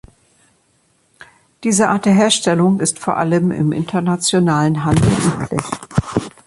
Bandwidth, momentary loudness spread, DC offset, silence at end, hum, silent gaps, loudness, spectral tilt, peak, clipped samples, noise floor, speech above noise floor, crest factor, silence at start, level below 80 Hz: 11.5 kHz; 8 LU; under 0.1%; 0.15 s; none; none; -16 LUFS; -5 dB/octave; -2 dBFS; under 0.1%; -59 dBFS; 44 dB; 14 dB; 1.6 s; -40 dBFS